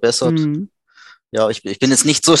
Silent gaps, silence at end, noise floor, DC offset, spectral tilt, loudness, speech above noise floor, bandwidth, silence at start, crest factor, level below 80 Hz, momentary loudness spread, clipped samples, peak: none; 0 s; -47 dBFS; under 0.1%; -3.5 dB/octave; -16 LUFS; 32 dB; 13 kHz; 0 s; 16 dB; -58 dBFS; 13 LU; under 0.1%; 0 dBFS